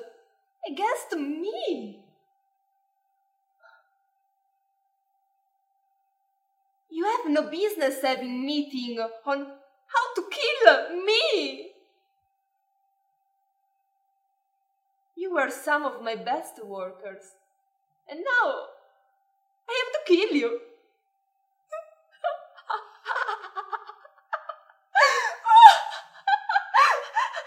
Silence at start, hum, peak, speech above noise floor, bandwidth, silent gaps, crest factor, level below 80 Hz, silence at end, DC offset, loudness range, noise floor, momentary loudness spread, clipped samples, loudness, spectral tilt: 0 s; none; 0 dBFS; 49 dB; 16 kHz; none; 26 dB; under -90 dBFS; 0 s; under 0.1%; 15 LU; -75 dBFS; 19 LU; under 0.1%; -23 LUFS; -1.5 dB/octave